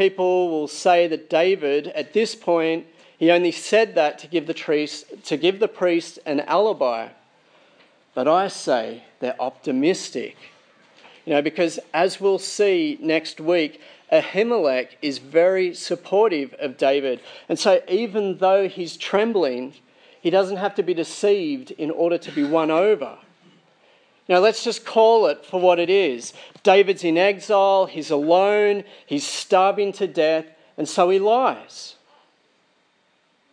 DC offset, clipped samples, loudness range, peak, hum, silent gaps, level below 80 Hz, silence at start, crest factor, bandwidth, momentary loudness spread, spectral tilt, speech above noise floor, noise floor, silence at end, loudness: under 0.1%; under 0.1%; 5 LU; -2 dBFS; none; none; -84 dBFS; 0 s; 20 dB; 10.5 kHz; 11 LU; -4 dB/octave; 44 dB; -64 dBFS; 1.6 s; -21 LUFS